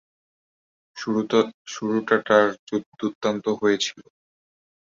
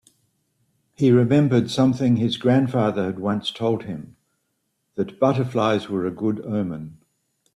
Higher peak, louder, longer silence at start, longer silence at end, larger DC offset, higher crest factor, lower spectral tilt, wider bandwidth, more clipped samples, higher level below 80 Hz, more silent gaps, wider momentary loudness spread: about the same, -4 dBFS vs -6 dBFS; about the same, -23 LUFS vs -21 LUFS; about the same, 0.95 s vs 1 s; first, 0.85 s vs 0.6 s; neither; about the same, 22 dB vs 18 dB; second, -4.5 dB/octave vs -7.5 dB/octave; second, 7.6 kHz vs 11.5 kHz; neither; second, -68 dBFS vs -60 dBFS; first, 1.54-1.65 s, 2.59-2.67 s, 2.86-2.92 s, 3.15-3.21 s vs none; about the same, 12 LU vs 12 LU